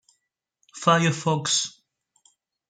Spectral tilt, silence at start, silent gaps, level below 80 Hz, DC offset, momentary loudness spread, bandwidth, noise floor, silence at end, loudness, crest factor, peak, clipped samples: -3.5 dB/octave; 0.75 s; none; -70 dBFS; under 0.1%; 6 LU; 9.6 kHz; -77 dBFS; 1 s; -23 LUFS; 22 dB; -6 dBFS; under 0.1%